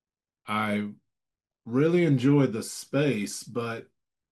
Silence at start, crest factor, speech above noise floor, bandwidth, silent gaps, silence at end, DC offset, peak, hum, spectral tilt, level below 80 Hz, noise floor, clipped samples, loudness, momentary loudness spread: 0.45 s; 16 dB; 64 dB; 12.5 kHz; none; 0.5 s; under 0.1%; -10 dBFS; none; -6.5 dB/octave; -72 dBFS; -89 dBFS; under 0.1%; -26 LUFS; 12 LU